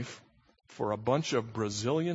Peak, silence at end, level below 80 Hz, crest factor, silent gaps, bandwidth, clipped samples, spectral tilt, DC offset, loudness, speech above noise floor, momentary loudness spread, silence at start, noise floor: -14 dBFS; 0 s; -66 dBFS; 18 dB; none; 8 kHz; under 0.1%; -5 dB/octave; under 0.1%; -32 LUFS; 24 dB; 11 LU; 0 s; -55 dBFS